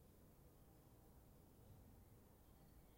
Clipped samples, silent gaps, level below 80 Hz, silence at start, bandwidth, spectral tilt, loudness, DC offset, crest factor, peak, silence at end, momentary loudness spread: under 0.1%; none; -72 dBFS; 0 s; 16.5 kHz; -6 dB/octave; -69 LUFS; under 0.1%; 12 dB; -54 dBFS; 0 s; 2 LU